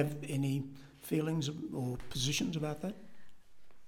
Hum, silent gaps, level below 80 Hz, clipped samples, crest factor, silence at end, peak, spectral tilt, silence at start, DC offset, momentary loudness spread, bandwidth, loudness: none; none; -58 dBFS; under 0.1%; 20 dB; 0 s; -16 dBFS; -5 dB/octave; 0 s; under 0.1%; 11 LU; 17.5 kHz; -36 LUFS